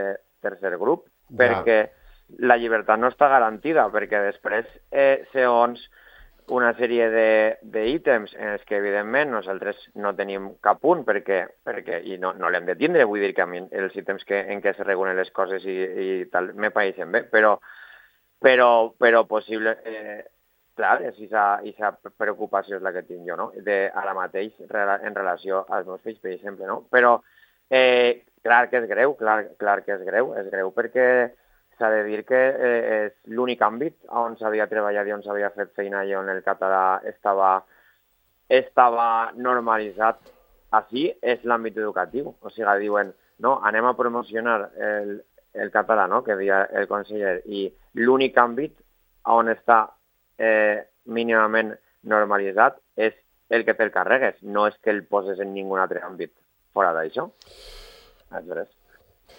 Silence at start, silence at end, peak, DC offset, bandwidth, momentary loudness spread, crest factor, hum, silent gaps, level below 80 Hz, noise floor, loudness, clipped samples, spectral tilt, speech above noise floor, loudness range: 0 s; 0.75 s; 0 dBFS; under 0.1%; 16.5 kHz; 12 LU; 22 dB; none; none; -64 dBFS; -66 dBFS; -22 LUFS; under 0.1%; -6.5 dB/octave; 44 dB; 5 LU